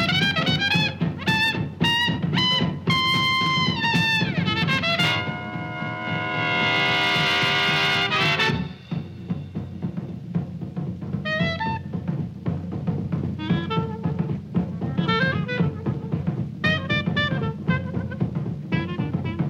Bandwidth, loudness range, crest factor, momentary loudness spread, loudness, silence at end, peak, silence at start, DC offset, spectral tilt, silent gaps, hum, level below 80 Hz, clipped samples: 15.5 kHz; 7 LU; 18 dB; 11 LU; -23 LUFS; 0 s; -6 dBFS; 0 s; under 0.1%; -5.5 dB/octave; none; none; -50 dBFS; under 0.1%